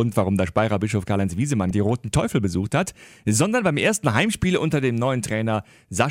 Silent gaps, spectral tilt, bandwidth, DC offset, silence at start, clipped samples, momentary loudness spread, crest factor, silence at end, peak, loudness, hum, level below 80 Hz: none; -5.5 dB/octave; 16 kHz; under 0.1%; 0 s; under 0.1%; 4 LU; 16 dB; 0 s; -4 dBFS; -22 LUFS; none; -46 dBFS